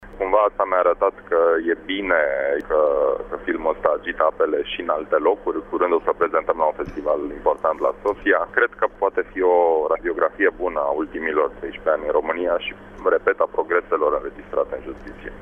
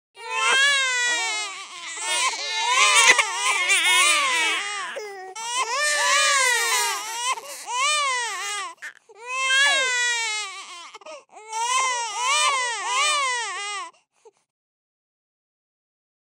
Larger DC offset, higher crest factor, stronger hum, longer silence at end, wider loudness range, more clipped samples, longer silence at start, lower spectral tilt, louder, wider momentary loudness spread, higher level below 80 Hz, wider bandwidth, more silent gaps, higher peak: neither; about the same, 20 dB vs 22 dB; neither; second, 0 s vs 2.05 s; second, 2 LU vs 6 LU; neither; second, 0 s vs 0.15 s; first, -6.5 dB/octave vs 3.5 dB/octave; about the same, -21 LUFS vs -20 LUFS; second, 7 LU vs 17 LU; first, -46 dBFS vs -84 dBFS; second, 3.7 kHz vs 16 kHz; neither; about the same, 0 dBFS vs -2 dBFS